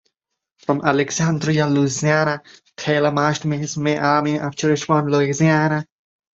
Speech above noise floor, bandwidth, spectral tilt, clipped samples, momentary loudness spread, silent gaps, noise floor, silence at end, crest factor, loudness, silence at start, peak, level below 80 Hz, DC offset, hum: 61 dB; 8 kHz; -5.5 dB/octave; under 0.1%; 7 LU; none; -79 dBFS; 0.55 s; 18 dB; -19 LUFS; 0.7 s; -2 dBFS; -58 dBFS; under 0.1%; none